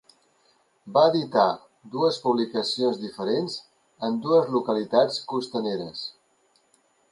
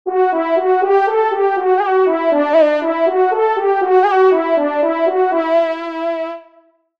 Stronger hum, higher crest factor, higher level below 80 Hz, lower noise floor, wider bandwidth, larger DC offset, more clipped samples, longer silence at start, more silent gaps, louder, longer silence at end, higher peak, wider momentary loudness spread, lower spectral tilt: neither; first, 18 dB vs 12 dB; about the same, -74 dBFS vs -70 dBFS; first, -65 dBFS vs -52 dBFS; first, 11.5 kHz vs 6 kHz; second, under 0.1% vs 0.2%; neither; first, 0.85 s vs 0.05 s; neither; second, -24 LUFS vs -15 LUFS; first, 1 s vs 0.6 s; second, -6 dBFS vs -2 dBFS; first, 13 LU vs 8 LU; about the same, -5.5 dB/octave vs -4.5 dB/octave